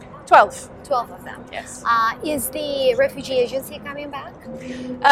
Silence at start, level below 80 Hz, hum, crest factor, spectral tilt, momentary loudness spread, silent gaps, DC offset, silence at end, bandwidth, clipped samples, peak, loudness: 0 s; -52 dBFS; none; 20 dB; -3 dB/octave; 19 LU; none; under 0.1%; 0 s; 16 kHz; under 0.1%; 0 dBFS; -20 LUFS